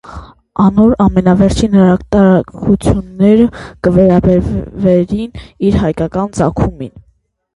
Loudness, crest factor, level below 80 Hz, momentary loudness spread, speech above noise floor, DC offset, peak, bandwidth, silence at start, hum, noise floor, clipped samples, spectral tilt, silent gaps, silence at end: -11 LUFS; 12 dB; -28 dBFS; 9 LU; 45 dB; under 0.1%; 0 dBFS; 11.5 kHz; 0.05 s; none; -56 dBFS; under 0.1%; -8 dB/octave; none; 0.55 s